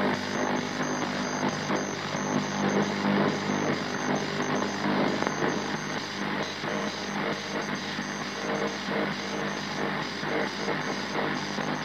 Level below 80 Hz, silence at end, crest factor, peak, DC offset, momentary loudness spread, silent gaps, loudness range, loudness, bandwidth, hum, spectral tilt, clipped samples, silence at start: -68 dBFS; 0 s; 20 dB; -10 dBFS; under 0.1%; 5 LU; none; 3 LU; -29 LUFS; 16 kHz; 50 Hz at -40 dBFS; -4 dB/octave; under 0.1%; 0 s